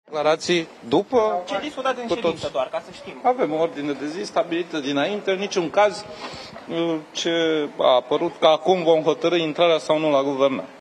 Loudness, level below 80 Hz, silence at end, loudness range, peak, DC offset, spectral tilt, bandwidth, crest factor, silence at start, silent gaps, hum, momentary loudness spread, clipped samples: -22 LUFS; -62 dBFS; 0 s; 5 LU; -2 dBFS; under 0.1%; -4.5 dB/octave; 10.5 kHz; 20 dB; 0.1 s; none; none; 9 LU; under 0.1%